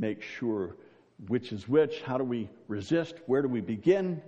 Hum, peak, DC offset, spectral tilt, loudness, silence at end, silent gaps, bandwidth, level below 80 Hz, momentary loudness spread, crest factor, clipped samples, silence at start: none; -12 dBFS; under 0.1%; -7.5 dB/octave; -30 LUFS; 0 s; none; 8.2 kHz; -70 dBFS; 10 LU; 18 dB; under 0.1%; 0 s